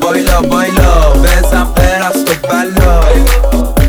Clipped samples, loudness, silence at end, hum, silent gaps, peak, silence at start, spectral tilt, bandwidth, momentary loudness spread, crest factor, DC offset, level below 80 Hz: under 0.1%; -10 LUFS; 0 s; none; none; 0 dBFS; 0 s; -5 dB/octave; 19.5 kHz; 4 LU; 8 dB; under 0.1%; -10 dBFS